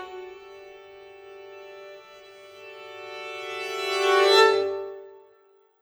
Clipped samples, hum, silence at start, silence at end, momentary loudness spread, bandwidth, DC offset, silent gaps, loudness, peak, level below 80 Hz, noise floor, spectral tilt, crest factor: under 0.1%; none; 0 s; 0.65 s; 28 LU; over 20 kHz; under 0.1%; none; -22 LUFS; -4 dBFS; -78 dBFS; -60 dBFS; -1 dB/octave; 22 dB